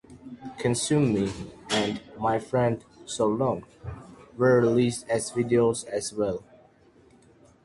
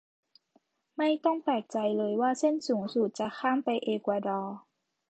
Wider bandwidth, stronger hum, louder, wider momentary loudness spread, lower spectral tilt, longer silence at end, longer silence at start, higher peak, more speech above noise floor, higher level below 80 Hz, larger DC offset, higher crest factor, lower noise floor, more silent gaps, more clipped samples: first, 11.5 kHz vs 9 kHz; neither; first, -26 LUFS vs -30 LUFS; first, 19 LU vs 6 LU; about the same, -5.5 dB/octave vs -5.5 dB/octave; first, 1.25 s vs 0.5 s; second, 0.1 s vs 1 s; first, -10 dBFS vs -14 dBFS; second, 33 dB vs 41 dB; first, -54 dBFS vs -82 dBFS; neither; about the same, 18 dB vs 16 dB; second, -57 dBFS vs -71 dBFS; neither; neither